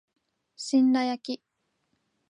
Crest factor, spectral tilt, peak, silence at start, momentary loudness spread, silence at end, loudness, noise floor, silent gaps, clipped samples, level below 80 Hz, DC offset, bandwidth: 16 dB; -3 dB/octave; -14 dBFS; 0.6 s; 16 LU; 0.95 s; -25 LUFS; -76 dBFS; none; under 0.1%; -84 dBFS; under 0.1%; 10.5 kHz